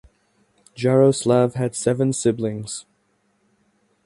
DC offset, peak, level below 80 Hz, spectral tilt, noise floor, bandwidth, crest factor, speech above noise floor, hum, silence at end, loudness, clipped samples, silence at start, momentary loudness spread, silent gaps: under 0.1%; -4 dBFS; -60 dBFS; -6 dB/octave; -66 dBFS; 11.5 kHz; 18 dB; 47 dB; none; 1.25 s; -20 LUFS; under 0.1%; 0.75 s; 13 LU; none